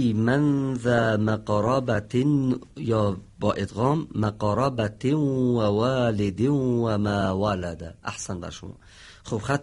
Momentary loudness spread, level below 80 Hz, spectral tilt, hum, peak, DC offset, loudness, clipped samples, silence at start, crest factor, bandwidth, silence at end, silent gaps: 11 LU; -50 dBFS; -7 dB/octave; none; -6 dBFS; under 0.1%; -25 LUFS; under 0.1%; 0 s; 18 dB; 11.5 kHz; 0 s; none